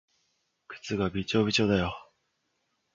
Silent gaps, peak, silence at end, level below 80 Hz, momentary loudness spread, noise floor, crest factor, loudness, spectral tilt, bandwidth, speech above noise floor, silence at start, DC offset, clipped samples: none; -12 dBFS; 0.9 s; -52 dBFS; 19 LU; -77 dBFS; 20 dB; -28 LUFS; -5 dB/octave; 7.8 kHz; 50 dB; 0.7 s; under 0.1%; under 0.1%